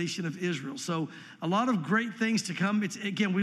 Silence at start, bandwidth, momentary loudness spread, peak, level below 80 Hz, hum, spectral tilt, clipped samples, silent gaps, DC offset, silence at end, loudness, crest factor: 0 s; 13.5 kHz; 7 LU; -14 dBFS; -84 dBFS; none; -5 dB/octave; under 0.1%; none; under 0.1%; 0 s; -30 LUFS; 16 dB